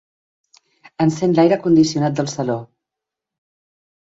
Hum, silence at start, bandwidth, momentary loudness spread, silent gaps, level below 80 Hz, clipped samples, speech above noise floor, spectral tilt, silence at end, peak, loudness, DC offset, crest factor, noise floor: none; 1 s; 7.8 kHz; 9 LU; none; -58 dBFS; under 0.1%; 68 dB; -6.5 dB/octave; 1.5 s; -2 dBFS; -17 LUFS; under 0.1%; 18 dB; -84 dBFS